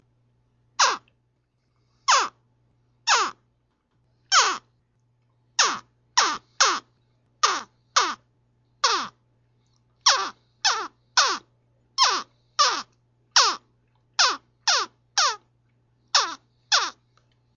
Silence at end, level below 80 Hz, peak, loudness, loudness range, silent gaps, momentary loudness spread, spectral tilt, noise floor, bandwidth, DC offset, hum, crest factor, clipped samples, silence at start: 0.65 s; -76 dBFS; -4 dBFS; -22 LUFS; 3 LU; none; 12 LU; 2 dB/octave; -70 dBFS; 7.8 kHz; under 0.1%; none; 22 dB; under 0.1%; 0.8 s